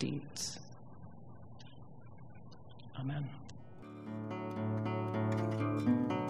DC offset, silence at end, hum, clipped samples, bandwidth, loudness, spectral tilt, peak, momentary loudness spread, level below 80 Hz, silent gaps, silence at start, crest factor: under 0.1%; 0 s; none; under 0.1%; 13 kHz; -38 LUFS; -6 dB/octave; -20 dBFS; 21 LU; -70 dBFS; none; 0 s; 18 dB